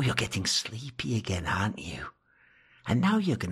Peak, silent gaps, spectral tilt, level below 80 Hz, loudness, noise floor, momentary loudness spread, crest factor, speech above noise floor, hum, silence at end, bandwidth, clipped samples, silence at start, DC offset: -8 dBFS; none; -4.5 dB/octave; -52 dBFS; -29 LUFS; -63 dBFS; 14 LU; 22 dB; 34 dB; none; 0 s; 15 kHz; under 0.1%; 0 s; under 0.1%